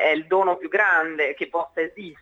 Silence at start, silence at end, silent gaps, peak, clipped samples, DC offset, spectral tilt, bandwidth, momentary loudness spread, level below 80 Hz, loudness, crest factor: 0 s; 0.1 s; none; -6 dBFS; under 0.1%; under 0.1%; -5 dB/octave; 7 kHz; 9 LU; -70 dBFS; -22 LUFS; 18 dB